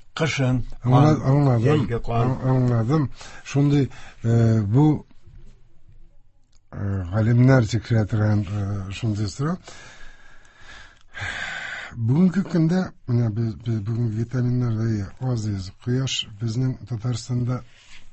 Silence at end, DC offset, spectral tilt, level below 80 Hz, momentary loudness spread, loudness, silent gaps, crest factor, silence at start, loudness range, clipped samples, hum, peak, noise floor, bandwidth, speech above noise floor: 0 s; under 0.1%; -7 dB/octave; -44 dBFS; 11 LU; -22 LUFS; none; 18 dB; 0 s; 6 LU; under 0.1%; none; -4 dBFS; -52 dBFS; 8.4 kHz; 31 dB